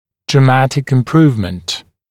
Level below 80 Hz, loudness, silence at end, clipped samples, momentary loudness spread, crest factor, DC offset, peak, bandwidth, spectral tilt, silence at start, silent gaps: -46 dBFS; -13 LUFS; 0.3 s; under 0.1%; 12 LU; 14 dB; under 0.1%; 0 dBFS; 12 kHz; -6.5 dB/octave; 0.3 s; none